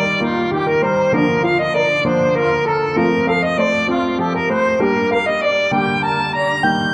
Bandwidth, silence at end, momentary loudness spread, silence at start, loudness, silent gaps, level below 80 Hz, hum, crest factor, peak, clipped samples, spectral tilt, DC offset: 10 kHz; 0 s; 2 LU; 0 s; -17 LUFS; none; -48 dBFS; none; 12 dB; -4 dBFS; under 0.1%; -6 dB/octave; under 0.1%